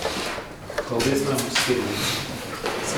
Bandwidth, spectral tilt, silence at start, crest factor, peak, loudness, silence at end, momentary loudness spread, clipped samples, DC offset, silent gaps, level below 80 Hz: over 20 kHz; -3.5 dB/octave; 0 s; 16 dB; -8 dBFS; -25 LUFS; 0 s; 10 LU; under 0.1%; under 0.1%; none; -48 dBFS